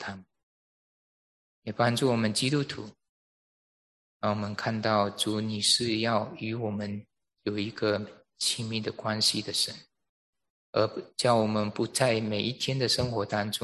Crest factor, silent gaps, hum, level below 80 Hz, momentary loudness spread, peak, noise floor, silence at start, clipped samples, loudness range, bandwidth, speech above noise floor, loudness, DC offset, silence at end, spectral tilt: 20 dB; 0.43-1.62 s, 3.09-4.20 s, 10.09-10.33 s, 10.50-10.73 s; none; -62 dBFS; 12 LU; -10 dBFS; under -90 dBFS; 0 s; under 0.1%; 3 LU; 13 kHz; over 61 dB; -28 LUFS; under 0.1%; 0 s; -4 dB/octave